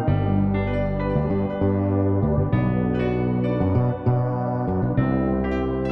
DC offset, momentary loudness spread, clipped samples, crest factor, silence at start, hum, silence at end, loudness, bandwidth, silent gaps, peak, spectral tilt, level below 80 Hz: under 0.1%; 3 LU; under 0.1%; 14 dB; 0 s; none; 0 s; -22 LUFS; 4.9 kHz; none; -8 dBFS; -11 dB/octave; -36 dBFS